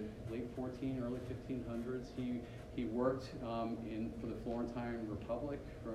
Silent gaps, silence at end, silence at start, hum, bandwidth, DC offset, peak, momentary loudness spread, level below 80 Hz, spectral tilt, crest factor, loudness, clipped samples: none; 0 s; 0 s; none; 13 kHz; under 0.1%; -22 dBFS; 7 LU; -56 dBFS; -8 dB/octave; 20 dB; -42 LUFS; under 0.1%